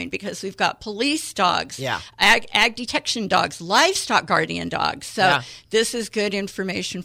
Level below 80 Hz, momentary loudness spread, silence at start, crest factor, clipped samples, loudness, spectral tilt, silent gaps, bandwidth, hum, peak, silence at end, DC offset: -52 dBFS; 10 LU; 0 s; 18 dB; under 0.1%; -21 LUFS; -2.5 dB/octave; none; 17 kHz; none; -4 dBFS; 0 s; under 0.1%